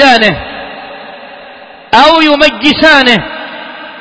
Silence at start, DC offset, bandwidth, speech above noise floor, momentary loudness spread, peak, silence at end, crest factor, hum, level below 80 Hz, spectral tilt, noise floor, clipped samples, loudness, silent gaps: 0 s; under 0.1%; 8 kHz; 25 dB; 22 LU; 0 dBFS; 0 s; 10 dB; none; -40 dBFS; -4 dB/octave; -32 dBFS; 3%; -6 LUFS; none